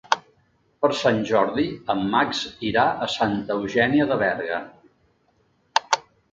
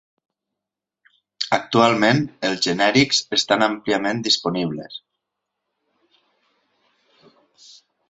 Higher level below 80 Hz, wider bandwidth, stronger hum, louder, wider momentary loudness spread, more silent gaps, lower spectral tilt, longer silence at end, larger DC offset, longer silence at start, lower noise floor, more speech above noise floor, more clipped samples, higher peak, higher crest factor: about the same, -56 dBFS vs -60 dBFS; about the same, 7.8 kHz vs 8.2 kHz; neither; second, -23 LUFS vs -19 LUFS; second, 6 LU vs 12 LU; neither; about the same, -4.5 dB/octave vs -4 dB/octave; second, 0.35 s vs 3.1 s; neither; second, 0.1 s vs 1.4 s; second, -64 dBFS vs -86 dBFS; second, 42 dB vs 66 dB; neither; about the same, 0 dBFS vs -2 dBFS; about the same, 24 dB vs 22 dB